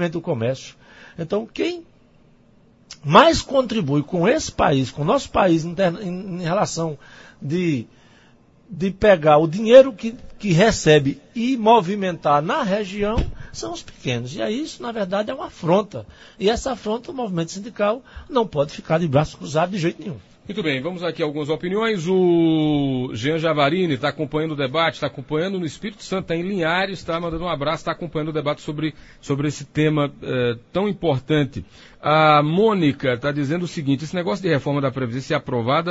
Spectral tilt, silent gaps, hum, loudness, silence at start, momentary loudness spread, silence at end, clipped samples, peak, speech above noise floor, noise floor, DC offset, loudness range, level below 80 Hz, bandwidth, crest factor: -6 dB/octave; none; none; -20 LUFS; 0 s; 13 LU; 0 s; under 0.1%; 0 dBFS; 33 dB; -53 dBFS; under 0.1%; 7 LU; -42 dBFS; 8 kHz; 20 dB